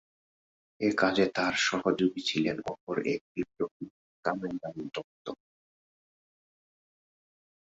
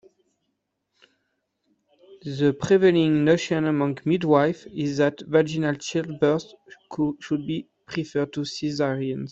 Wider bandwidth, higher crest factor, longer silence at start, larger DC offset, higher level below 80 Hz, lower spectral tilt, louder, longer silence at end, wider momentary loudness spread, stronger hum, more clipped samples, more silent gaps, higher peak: about the same, 8 kHz vs 8 kHz; about the same, 22 dB vs 20 dB; second, 0.8 s vs 2.1 s; neither; second, -68 dBFS vs -62 dBFS; second, -4.5 dB/octave vs -6.5 dB/octave; second, -30 LUFS vs -23 LUFS; first, 2.4 s vs 0 s; first, 16 LU vs 12 LU; neither; neither; first, 2.81-2.87 s, 3.21-3.35 s, 3.71-3.80 s, 3.90-4.23 s, 5.04-5.25 s vs none; second, -12 dBFS vs -4 dBFS